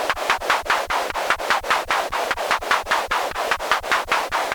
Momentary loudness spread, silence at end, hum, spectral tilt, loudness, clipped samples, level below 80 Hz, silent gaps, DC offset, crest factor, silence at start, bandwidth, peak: 3 LU; 0 s; none; -1 dB/octave; -21 LUFS; under 0.1%; -46 dBFS; none; under 0.1%; 20 dB; 0 s; 19.5 kHz; -2 dBFS